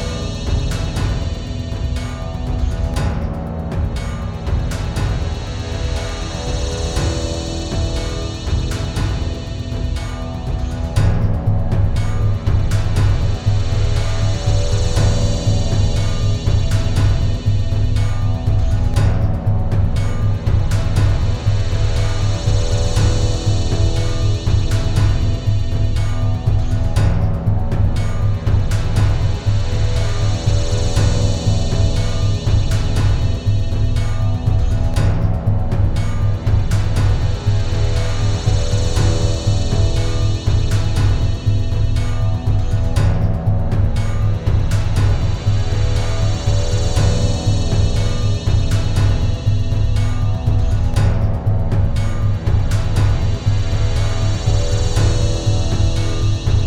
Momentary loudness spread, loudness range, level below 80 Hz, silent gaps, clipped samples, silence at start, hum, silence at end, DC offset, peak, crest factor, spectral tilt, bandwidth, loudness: 5 LU; 4 LU; -20 dBFS; none; under 0.1%; 0 s; none; 0 s; under 0.1%; -2 dBFS; 12 dB; -6 dB/octave; 11 kHz; -19 LUFS